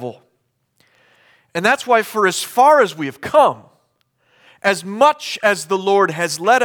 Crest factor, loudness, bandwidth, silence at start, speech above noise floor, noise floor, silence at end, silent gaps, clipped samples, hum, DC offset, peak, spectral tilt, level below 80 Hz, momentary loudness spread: 16 dB; -16 LUFS; over 20 kHz; 0 s; 52 dB; -67 dBFS; 0 s; none; under 0.1%; none; under 0.1%; -2 dBFS; -3.5 dB/octave; -66 dBFS; 8 LU